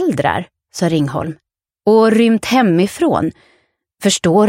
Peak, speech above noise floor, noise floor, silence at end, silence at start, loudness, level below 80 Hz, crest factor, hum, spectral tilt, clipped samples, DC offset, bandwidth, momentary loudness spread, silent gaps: 0 dBFS; 46 dB; -59 dBFS; 0 s; 0 s; -15 LUFS; -50 dBFS; 14 dB; none; -5.5 dB/octave; under 0.1%; under 0.1%; 16.5 kHz; 12 LU; none